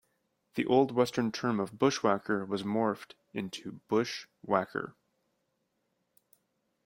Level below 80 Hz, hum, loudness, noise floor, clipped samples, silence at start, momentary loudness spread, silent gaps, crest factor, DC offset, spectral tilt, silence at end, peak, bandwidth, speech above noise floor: -72 dBFS; none; -31 LUFS; -79 dBFS; under 0.1%; 0.55 s; 14 LU; none; 22 dB; under 0.1%; -5.5 dB/octave; 1.95 s; -10 dBFS; 16.5 kHz; 48 dB